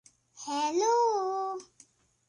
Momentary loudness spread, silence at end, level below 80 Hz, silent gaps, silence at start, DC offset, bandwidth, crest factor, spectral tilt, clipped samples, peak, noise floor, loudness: 15 LU; 0.65 s; -82 dBFS; none; 0.35 s; under 0.1%; 11 kHz; 14 dB; -1.5 dB/octave; under 0.1%; -16 dBFS; -62 dBFS; -29 LUFS